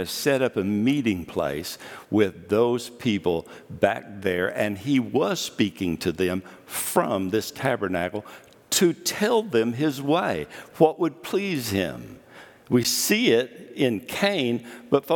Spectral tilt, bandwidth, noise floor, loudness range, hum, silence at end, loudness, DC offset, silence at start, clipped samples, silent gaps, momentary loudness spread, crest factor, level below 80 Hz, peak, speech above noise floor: -4.5 dB/octave; 19 kHz; -48 dBFS; 2 LU; none; 0 s; -24 LUFS; under 0.1%; 0 s; under 0.1%; none; 10 LU; 22 dB; -62 dBFS; -2 dBFS; 24 dB